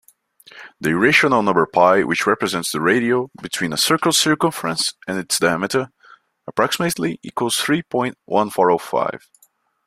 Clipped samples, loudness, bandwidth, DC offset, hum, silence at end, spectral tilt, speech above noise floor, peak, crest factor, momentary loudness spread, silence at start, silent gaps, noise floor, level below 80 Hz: under 0.1%; -18 LUFS; 16 kHz; under 0.1%; none; 0.7 s; -3.5 dB/octave; 41 dB; 0 dBFS; 18 dB; 10 LU; 0.55 s; none; -59 dBFS; -58 dBFS